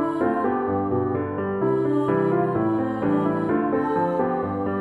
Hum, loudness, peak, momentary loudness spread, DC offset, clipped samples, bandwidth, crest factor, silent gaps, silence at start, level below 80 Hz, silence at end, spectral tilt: none; -23 LUFS; -8 dBFS; 4 LU; under 0.1%; under 0.1%; 7.8 kHz; 14 dB; none; 0 s; -56 dBFS; 0 s; -10 dB/octave